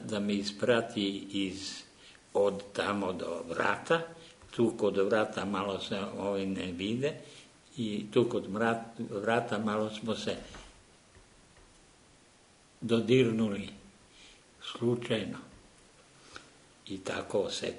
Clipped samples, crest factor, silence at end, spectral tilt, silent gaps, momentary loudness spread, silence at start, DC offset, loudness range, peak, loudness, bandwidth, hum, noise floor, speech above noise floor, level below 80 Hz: under 0.1%; 22 dB; 0 s; -5.5 dB/octave; none; 17 LU; 0 s; under 0.1%; 6 LU; -12 dBFS; -32 LUFS; 10.5 kHz; none; -61 dBFS; 30 dB; -66 dBFS